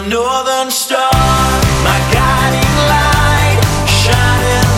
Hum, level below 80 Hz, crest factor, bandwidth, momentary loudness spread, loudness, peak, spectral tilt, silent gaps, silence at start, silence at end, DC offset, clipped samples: none; -20 dBFS; 10 dB; 16.5 kHz; 3 LU; -11 LUFS; 0 dBFS; -4 dB/octave; none; 0 s; 0 s; under 0.1%; under 0.1%